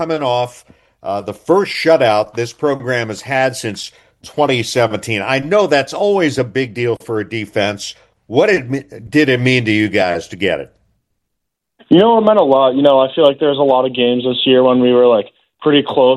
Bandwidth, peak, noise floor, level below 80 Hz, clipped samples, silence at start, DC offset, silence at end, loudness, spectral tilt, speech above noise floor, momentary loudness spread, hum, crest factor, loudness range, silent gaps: 12.5 kHz; 0 dBFS; -76 dBFS; -56 dBFS; under 0.1%; 0 s; under 0.1%; 0 s; -14 LUFS; -5.5 dB/octave; 62 dB; 12 LU; none; 14 dB; 5 LU; none